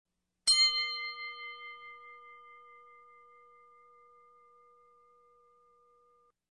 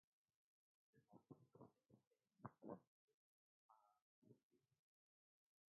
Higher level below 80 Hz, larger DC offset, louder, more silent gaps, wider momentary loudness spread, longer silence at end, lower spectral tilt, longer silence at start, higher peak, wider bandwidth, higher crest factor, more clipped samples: first, -78 dBFS vs under -90 dBFS; neither; first, -29 LUFS vs -63 LUFS; second, none vs 2.07-2.11 s, 2.87-3.08 s, 3.14-3.69 s, 4.02-4.22 s, 4.43-4.50 s; first, 29 LU vs 9 LU; first, 3.75 s vs 1.2 s; second, 4.5 dB/octave vs -3 dB/octave; second, 0.45 s vs 0.95 s; first, -14 dBFS vs -38 dBFS; first, 10 kHz vs 1.7 kHz; second, 24 dB vs 32 dB; neither